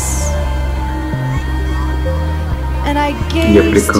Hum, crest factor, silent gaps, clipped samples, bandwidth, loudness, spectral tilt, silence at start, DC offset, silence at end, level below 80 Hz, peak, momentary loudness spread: none; 14 dB; none; under 0.1%; 16 kHz; -16 LUFS; -5.5 dB/octave; 0 s; under 0.1%; 0 s; -18 dBFS; 0 dBFS; 9 LU